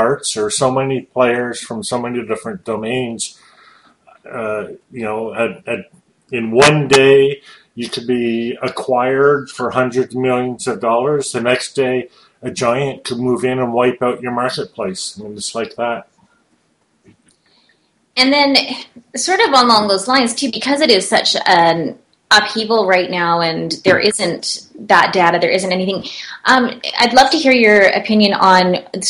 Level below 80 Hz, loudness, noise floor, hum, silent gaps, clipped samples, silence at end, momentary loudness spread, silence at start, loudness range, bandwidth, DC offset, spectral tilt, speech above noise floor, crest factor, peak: -54 dBFS; -15 LUFS; -61 dBFS; none; none; under 0.1%; 0 s; 14 LU; 0 s; 11 LU; 12 kHz; under 0.1%; -3.5 dB/octave; 46 dB; 16 dB; 0 dBFS